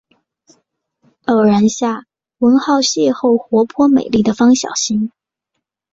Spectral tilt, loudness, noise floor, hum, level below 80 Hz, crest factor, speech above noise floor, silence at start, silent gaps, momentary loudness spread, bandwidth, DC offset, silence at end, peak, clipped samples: -4.5 dB/octave; -14 LUFS; -76 dBFS; none; -54 dBFS; 12 dB; 63 dB; 1.3 s; none; 8 LU; 8 kHz; under 0.1%; 0.85 s; -2 dBFS; under 0.1%